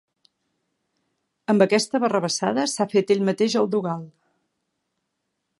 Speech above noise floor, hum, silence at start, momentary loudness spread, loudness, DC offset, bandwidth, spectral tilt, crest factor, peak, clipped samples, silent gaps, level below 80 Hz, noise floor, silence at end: 57 dB; none; 1.5 s; 8 LU; -22 LUFS; under 0.1%; 11.5 kHz; -4.5 dB/octave; 22 dB; -2 dBFS; under 0.1%; none; -74 dBFS; -78 dBFS; 1.5 s